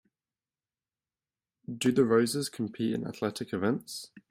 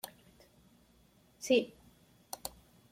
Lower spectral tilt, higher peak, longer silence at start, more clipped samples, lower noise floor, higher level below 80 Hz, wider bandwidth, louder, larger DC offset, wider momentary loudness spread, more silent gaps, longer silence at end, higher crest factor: first, -5 dB/octave vs -3 dB/octave; first, -12 dBFS vs -16 dBFS; first, 1.7 s vs 0.05 s; neither; first, under -90 dBFS vs -66 dBFS; about the same, -70 dBFS vs -70 dBFS; about the same, 16 kHz vs 16.5 kHz; first, -30 LUFS vs -35 LUFS; neither; about the same, 17 LU vs 17 LU; neither; second, 0.1 s vs 0.45 s; about the same, 20 dB vs 24 dB